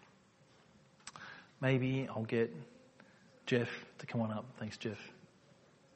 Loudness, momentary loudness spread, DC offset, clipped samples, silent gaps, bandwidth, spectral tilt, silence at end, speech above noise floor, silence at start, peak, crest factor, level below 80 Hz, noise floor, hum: -38 LUFS; 19 LU; under 0.1%; under 0.1%; none; 8.4 kHz; -6.5 dB/octave; 0.75 s; 29 dB; 1.05 s; -20 dBFS; 22 dB; -76 dBFS; -66 dBFS; none